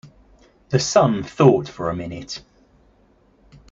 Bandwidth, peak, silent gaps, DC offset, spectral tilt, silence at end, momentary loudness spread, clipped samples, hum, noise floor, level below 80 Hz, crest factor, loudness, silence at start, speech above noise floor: 7.8 kHz; -2 dBFS; none; under 0.1%; -5.5 dB/octave; 1.3 s; 17 LU; under 0.1%; none; -57 dBFS; -52 dBFS; 20 dB; -19 LUFS; 0.05 s; 38 dB